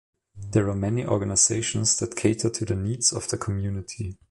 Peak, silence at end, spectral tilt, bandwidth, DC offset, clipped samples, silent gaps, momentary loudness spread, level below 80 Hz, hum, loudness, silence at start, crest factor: -8 dBFS; 0.15 s; -4 dB/octave; 11.5 kHz; under 0.1%; under 0.1%; none; 12 LU; -46 dBFS; none; -24 LUFS; 0.35 s; 18 dB